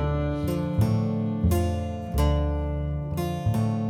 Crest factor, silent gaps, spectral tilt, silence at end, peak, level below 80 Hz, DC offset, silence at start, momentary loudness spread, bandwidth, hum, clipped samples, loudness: 14 dB; none; -7.5 dB/octave; 0 s; -12 dBFS; -32 dBFS; under 0.1%; 0 s; 5 LU; 16.5 kHz; none; under 0.1%; -26 LUFS